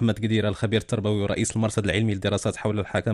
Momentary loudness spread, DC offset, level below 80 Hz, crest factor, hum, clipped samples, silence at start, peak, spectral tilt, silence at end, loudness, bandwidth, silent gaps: 2 LU; under 0.1%; -48 dBFS; 16 dB; none; under 0.1%; 0 s; -8 dBFS; -5.5 dB/octave; 0 s; -25 LUFS; 12 kHz; none